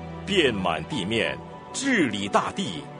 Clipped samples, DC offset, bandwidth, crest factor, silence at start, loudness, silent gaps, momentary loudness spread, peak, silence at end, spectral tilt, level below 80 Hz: under 0.1%; under 0.1%; 10 kHz; 20 dB; 0 s; -25 LUFS; none; 8 LU; -6 dBFS; 0 s; -4 dB/octave; -52 dBFS